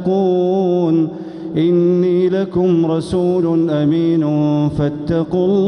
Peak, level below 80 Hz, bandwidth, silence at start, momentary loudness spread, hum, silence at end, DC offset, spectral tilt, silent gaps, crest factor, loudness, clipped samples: -6 dBFS; -44 dBFS; 10 kHz; 0 s; 4 LU; none; 0 s; under 0.1%; -9 dB/octave; none; 10 dB; -16 LUFS; under 0.1%